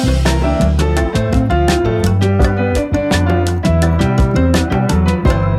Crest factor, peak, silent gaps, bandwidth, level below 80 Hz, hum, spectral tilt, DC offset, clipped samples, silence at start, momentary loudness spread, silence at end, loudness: 12 dB; 0 dBFS; none; 14 kHz; -18 dBFS; none; -6.5 dB/octave; under 0.1%; under 0.1%; 0 s; 2 LU; 0 s; -14 LUFS